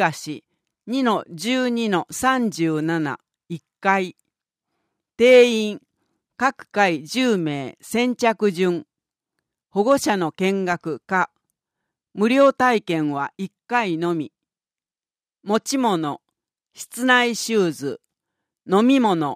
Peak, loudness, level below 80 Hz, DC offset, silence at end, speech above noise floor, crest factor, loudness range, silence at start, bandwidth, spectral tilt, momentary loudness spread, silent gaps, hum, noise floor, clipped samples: -2 dBFS; -20 LUFS; -66 dBFS; under 0.1%; 0 s; over 70 dB; 20 dB; 5 LU; 0 s; 15.5 kHz; -4.5 dB/octave; 16 LU; none; none; under -90 dBFS; under 0.1%